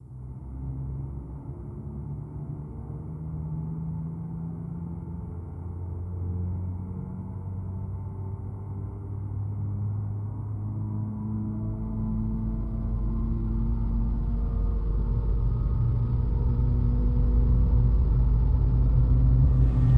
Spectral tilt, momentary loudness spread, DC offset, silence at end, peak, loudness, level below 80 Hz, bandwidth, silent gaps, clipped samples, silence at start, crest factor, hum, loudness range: -12 dB/octave; 14 LU; under 0.1%; 0 s; -10 dBFS; -29 LUFS; -28 dBFS; 2 kHz; none; under 0.1%; 0 s; 16 dB; none; 11 LU